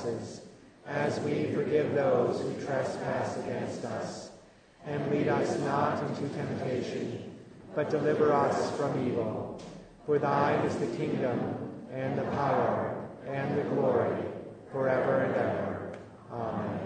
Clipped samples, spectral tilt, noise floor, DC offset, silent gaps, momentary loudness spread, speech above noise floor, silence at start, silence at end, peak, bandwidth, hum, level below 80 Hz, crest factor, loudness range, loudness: under 0.1%; -7 dB/octave; -55 dBFS; under 0.1%; none; 14 LU; 26 dB; 0 s; 0 s; -12 dBFS; 9.6 kHz; none; -66 dBFS; 18 dB; 3 LU; -31 LUFS